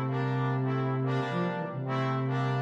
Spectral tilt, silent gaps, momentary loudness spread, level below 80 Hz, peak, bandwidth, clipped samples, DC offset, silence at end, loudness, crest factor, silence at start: -8.5 dB/octave; none; 3 LU; -70 dBFS; -18 dBFS; 6.6 kHz; under 0.1%; under 0.1%; 0 s; -30 LUFS; 12 dB; 0 s